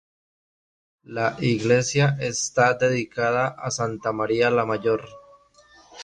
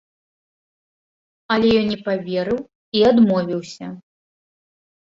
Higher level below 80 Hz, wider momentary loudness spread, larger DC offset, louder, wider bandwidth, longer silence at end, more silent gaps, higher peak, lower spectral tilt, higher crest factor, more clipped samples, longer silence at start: about the same, -58 dBFS vs -54 dBFS; second, 7 LU vs 15 LU; neither; second, -23 LUFS vs -19 LUFS; first, 10.5 kHz vs 7.6 kHz; second, 0 s vs 1.05 s; second, none vs 2.75-2.92 s; about the same, -6 dBFS vs -4 dBFS; second, -4.5 dB/octave vs -6.5 dB/octave; about the same, 18 dB vs 18 dB; neither; second, 1.1 s vs 1.5 s